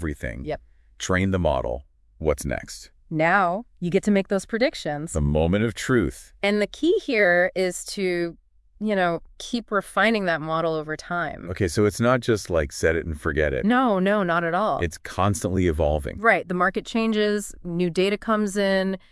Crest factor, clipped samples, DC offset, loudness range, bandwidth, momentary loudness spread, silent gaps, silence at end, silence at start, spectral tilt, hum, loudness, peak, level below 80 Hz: 20 dB; under 0.1%; under 0.1%; 3 LU; 12 kHz; 10 LU; none; 0.15 s; 0 s; -5.5 dB/octave; none; -23 LUFS; -4 dBFS; -42 dBFS